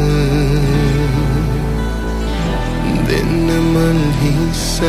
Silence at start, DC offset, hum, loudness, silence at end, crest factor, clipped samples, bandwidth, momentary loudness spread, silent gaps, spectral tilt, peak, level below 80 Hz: 0 s; under 0.1%; none; -16 LUFS; 0 s; 12 dB; under 0.1%; 15.5 kHz; 6 LU; none; -6 dB/octave; -2 dBFS; -20 dBFS